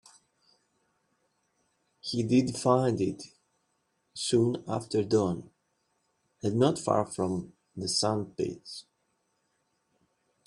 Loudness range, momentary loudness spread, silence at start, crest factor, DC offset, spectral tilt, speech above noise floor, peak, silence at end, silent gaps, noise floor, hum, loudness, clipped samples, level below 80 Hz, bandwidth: 3 LU; 17 LU; 2.05 s; 22 dB; under 0.1%; -5.5 dB/octave; 48 dB; -8 dBFS; 1.65 s; none; -76 dBFS; none; -29 LUFS; under 0.1%; -66 dBFS; 12 kHz